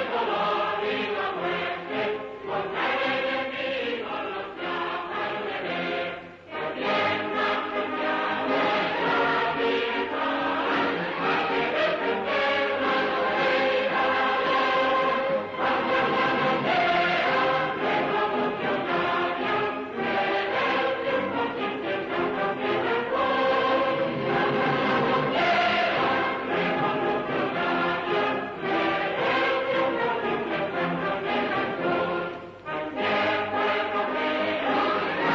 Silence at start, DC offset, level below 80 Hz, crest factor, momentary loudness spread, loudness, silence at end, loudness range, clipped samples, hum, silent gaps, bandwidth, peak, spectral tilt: 0 s; under 0.1%; -62 dBFS; 14 dB; 7 LU; -25 LUFS; 0 s; 5 LU; under 0.1%; none; none; 7.6 kHz; -12 dBFS; -5.5 dB/octave